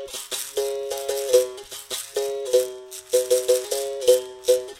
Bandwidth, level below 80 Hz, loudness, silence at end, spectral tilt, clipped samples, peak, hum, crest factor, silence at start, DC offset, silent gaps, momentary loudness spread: 16.5 kHz; -64 dBFS; -23 LUFS; 0 s; -1 dB/octave; under 0.1%; -4 dBFS; none; 20 dB; 0 s; under 0.1%; none; 10 LU